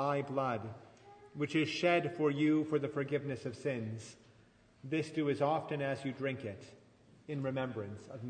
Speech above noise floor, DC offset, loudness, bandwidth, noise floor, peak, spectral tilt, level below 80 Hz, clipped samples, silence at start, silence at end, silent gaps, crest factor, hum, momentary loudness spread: 29 dB; under 0.1%; -36 LUFS; 9.6 kHz; -65 dBFS; -18 dBFS; -6.5 dB/octave; -76 dBFS; under 0.1%; 0 s; 0 s; none; 18 dB; none; 15 LU